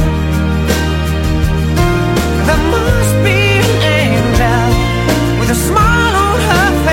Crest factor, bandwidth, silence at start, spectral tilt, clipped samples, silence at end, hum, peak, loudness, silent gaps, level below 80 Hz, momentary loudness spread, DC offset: 12 dB; 16.5 kHz; 0 s; -5.5 dB/octave; under 0.1%; 0 s; none; 0 dBFS; -12 LUFS; none; -18 dBFS; 4 LU; under 0.1%